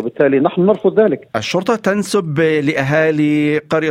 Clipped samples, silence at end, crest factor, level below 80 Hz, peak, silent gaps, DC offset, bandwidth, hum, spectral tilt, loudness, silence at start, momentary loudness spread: under 0.1%; 0 s; 14 dB; -56 dBFS; 0 dBFS; none; under 0.1%; 15.5 kHz; none; -6 dB/octave; -15 LUFS; 0 s; 4 LU